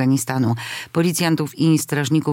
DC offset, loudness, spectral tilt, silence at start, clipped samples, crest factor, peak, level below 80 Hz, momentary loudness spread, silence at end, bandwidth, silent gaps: under 0.1%; -20 LUFS; -5.5 dB/octave; 0 s; under 0.1%; 14 dB; -4 dBFS; -66 dBFS; 4 LU; 0 s; 17 kHz; none